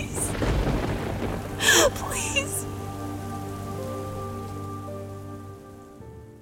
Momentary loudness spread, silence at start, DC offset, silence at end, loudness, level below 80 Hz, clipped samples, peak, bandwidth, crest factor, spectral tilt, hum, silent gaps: 24 LU; 0 s; under 0.1%; 0 s; -26 LUFS; -38 dBFS; under 0.1%; -6 dBFS; 17 kHz; 22 dB; -3 dB/octave; none; none